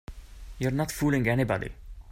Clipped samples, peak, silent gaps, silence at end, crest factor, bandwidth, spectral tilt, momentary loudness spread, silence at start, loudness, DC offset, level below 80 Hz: under 0.1%; -12 dBFS; none; 0 s; 18 dB; 16 kHz; -6.5 dB/octave; 23 LU; 0.1 s; -28 LUFS; under 0.1%; -44 dBFS